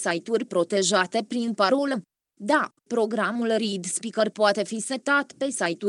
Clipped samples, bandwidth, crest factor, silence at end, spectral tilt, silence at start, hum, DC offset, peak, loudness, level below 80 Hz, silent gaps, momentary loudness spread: under 0.1%; 12 kHz; 20 dB; 0 s; -3.5 dB/octave; 0 s; none; under 0.1%; -6 dBFS; -25 LUFS; -84 dBFS; none; 7 LU